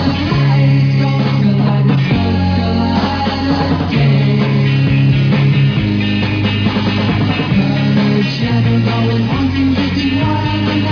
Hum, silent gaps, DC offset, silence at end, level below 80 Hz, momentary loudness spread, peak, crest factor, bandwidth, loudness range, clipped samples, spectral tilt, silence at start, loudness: none; none; under 0.1%; 0 s; -34 dBFS; 3 LU; -2 dBFS; 10 dB; 5.4 kHz; 1 LU; under 0.1%; -8 dB/octave; 0 s; -13 LUFS